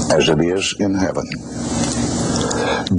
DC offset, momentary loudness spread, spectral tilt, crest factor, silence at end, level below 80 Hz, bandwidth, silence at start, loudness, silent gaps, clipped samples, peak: under 0.1%; 9 LU; -4.5 dB/octave; 14 dB; 0 s; -38 dBFS; 10.5 kHz; 0 s; -19 LUFS; none; under 0.1%; -4 dBFS